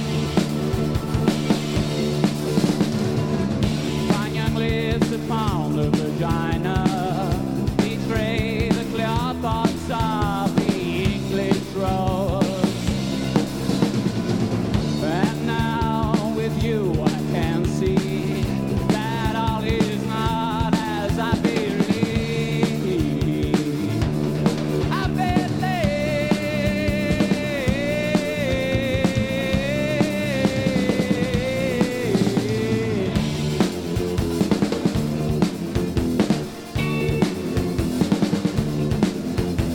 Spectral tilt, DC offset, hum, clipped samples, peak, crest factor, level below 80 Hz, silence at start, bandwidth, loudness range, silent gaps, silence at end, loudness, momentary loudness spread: -6.5 dB/octave; under 0.1%; none; under 0.1%; -4 dBFS; 18 dB; -36 dBFS; 0 s; 17.5 kHz; 1 LU; none; 0 s; -22 LUFS; 2 LU